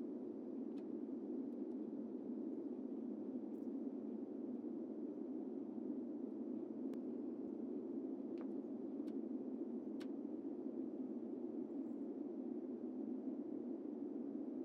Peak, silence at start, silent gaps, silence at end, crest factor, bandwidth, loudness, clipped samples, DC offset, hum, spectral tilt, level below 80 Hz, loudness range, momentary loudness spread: -34 dBFS; 0 s; none; 0 s; 12 dB; 5.8 kHz; -47 LUFS; under 0.1%; under 0.1%; none; -9 dB/octave; under -90 dBFS; 0 LU; 1 LU